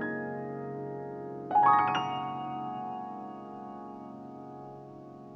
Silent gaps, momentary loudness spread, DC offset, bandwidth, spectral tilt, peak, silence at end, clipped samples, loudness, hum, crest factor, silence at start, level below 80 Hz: none; 21 LU; under 0.1%; 6.2 kHz; -6.5 dB/octave; -12 dBFS; 0 s; under 0.1%; -31 LUFS; none; 20 dB; 0 s; -76 dBFS